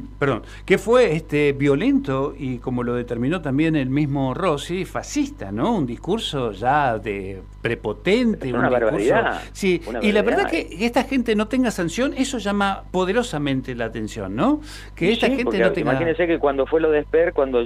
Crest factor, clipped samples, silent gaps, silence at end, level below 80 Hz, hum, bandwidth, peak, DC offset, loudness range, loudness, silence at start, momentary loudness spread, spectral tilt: 18 dB; under 0.1%; none; 0 s; -40 dBFS; 50 Hz at -40 dBFS; 15 kHz; -2 dBFS; under 0.1%; 3 LU; -21 LUFS; 0 s; 8 LU; -6 dB/octave